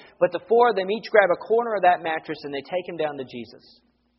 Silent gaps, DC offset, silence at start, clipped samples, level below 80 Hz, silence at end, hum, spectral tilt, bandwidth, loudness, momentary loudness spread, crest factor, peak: none; under 0.1%; 0.2 s; under 0.1%; -70 dBFS; 0.75 s; none; -2.5 dB/octave; 5.8 kHz; -22 LUFS; 15 LU; 22 dB; -2 dBFS